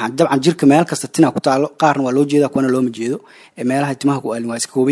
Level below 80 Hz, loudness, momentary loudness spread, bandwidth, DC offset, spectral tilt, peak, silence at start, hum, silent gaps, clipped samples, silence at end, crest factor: -62 dBFS; -16 LUFS; 9 LU; 12 kHz; under 0.1%; -5.5 dB/octave; 0 dBFS; 0 s; none; none; under 0.1%; 0 s; 16 dB